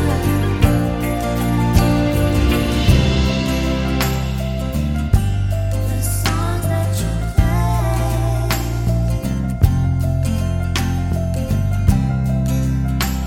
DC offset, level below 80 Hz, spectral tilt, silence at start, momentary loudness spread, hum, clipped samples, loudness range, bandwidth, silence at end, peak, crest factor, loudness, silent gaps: under 0.1%; -22 dBFS; -6 dB/octave; 0 s; 5 LU; none; under 0.1%; 3 LU; 17 kHz; 0 s; 0 dBFS; 16 dB; -18 LUFS; none